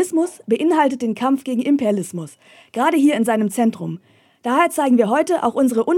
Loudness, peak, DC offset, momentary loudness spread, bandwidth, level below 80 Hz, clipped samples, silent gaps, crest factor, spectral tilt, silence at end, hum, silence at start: -18 LUFS; -4 dBFS; under 0.1%; 14 LU; 16.5 kHz; -74 dBFS; under 0.1%; none; 14 dB; -5.5 dB/octave; 0 s; none; 0 s